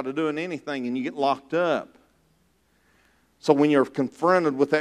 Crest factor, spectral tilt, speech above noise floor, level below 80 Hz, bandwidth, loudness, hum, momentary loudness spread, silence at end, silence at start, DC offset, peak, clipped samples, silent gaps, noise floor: 20 dB; -6.5 dB/octave; 42 dB; -72 dBFS; 11 kHz; -24 LUFS; none; 10 LU; 0 s; 0 s; under 0.1%; -4 dBFS; under 0.1%; none; -65 dBFS